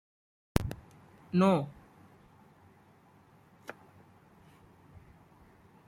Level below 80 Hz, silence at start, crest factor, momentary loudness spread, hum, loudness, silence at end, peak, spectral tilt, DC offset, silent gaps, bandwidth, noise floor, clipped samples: -52 dBFS; 0.55 s; 30 dB; 23 LU; none; -31 LUFS; 2.15 s; -6 dBFS; -7 dB/octave; under 0.1%; none; 16 kHz; -61 dBFS; under 0.1%